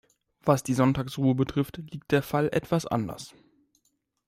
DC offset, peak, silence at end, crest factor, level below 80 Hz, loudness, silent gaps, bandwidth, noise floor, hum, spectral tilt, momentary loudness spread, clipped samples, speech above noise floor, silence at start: under 0.1%; -8 dBFS; 1 s; 20 dB; -56 dBFS; -27 LUFS; none; 16 kHz; -74 dBFS; none; -6.5 dB/octave; 12 LU; under 0.1%; 48 dB; 0.45 s